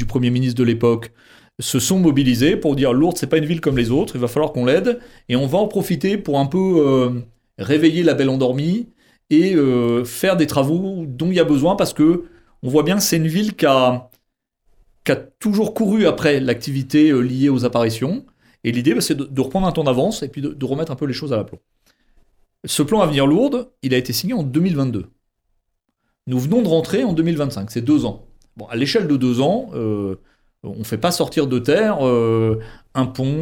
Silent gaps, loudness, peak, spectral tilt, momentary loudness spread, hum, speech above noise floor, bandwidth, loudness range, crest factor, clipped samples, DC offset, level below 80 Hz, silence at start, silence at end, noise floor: none; -18 LUFS; -2 dBFS; -6 dB/octave; 10 LU; none; 55 dB; 17 kHz; 4 LU; 16 dB; under 0.1%; under 0.1%; -46 dBFS; 0 s; 0 s; -73 dBFS